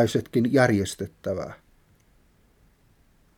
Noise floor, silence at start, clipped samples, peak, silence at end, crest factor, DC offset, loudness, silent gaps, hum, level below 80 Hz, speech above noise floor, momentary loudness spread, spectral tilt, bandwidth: -61 dBFS; 0 s; under 0.1%; -6 dBFS; 1.85 s; 20 dB; under 0.1%; -24 LUFS; none; none; -58 dBFS; 37 dB; 13 LU; -6 dB/octave; 17.5 kHz